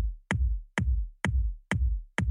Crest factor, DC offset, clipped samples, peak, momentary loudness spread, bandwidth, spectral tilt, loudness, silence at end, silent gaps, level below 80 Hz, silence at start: 18 dB; under 0.1%; under 0.1%; -10 dBFS; 2 LU; 11 kHz; -6 dB/octave; -31 LUFS; 0 s; none; -30 dBFS; 0 s